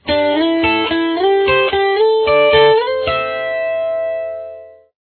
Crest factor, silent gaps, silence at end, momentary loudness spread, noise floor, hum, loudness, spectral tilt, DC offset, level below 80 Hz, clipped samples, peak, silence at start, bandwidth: 14 dB; none; 0.3 s; 10 LU; -35 dBFS; none; -14 LUFS; -8 dB/octave; under 0.1%; -44 dBFS; under 0.1%; 0 dBFS; 0.05 s; 4.5 kHz